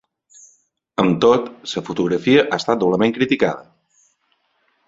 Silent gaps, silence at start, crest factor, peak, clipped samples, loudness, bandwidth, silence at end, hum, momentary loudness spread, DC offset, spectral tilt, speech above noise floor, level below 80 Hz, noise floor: none; 1 s; 20 dB; 0 dBFS; under 0.1%; -18 LUFS; 7.8 kHz; 1.25 s; none; 11 LU; under 0.1%; -6 dB/octave; 49 dB; -56 dBFS; -66 dBFS